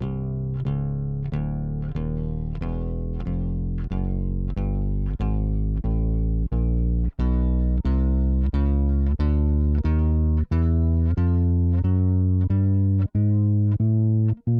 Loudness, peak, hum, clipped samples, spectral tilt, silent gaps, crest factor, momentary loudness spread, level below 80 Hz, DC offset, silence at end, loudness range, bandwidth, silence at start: -23 LUFS; -12 dBFS; none; under 0.1%; -12 dB/octave; none; 10 dB; 7 LU; -26 dBFS; under 0.1%; 0 s; 7 LU; 4.3 kHz; 0 s